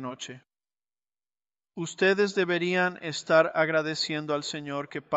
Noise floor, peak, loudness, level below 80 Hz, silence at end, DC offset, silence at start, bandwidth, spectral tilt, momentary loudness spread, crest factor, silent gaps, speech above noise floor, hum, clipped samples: under -90 dBFS; -8 dBFS; -26 LUFS; -74 dBFS; 0 s; under 0.1%; 0 s; 8.2 kHz; -4.5 dB/octave; 14 LU; 20 dB; none; over 63 dB; none; under 0.1%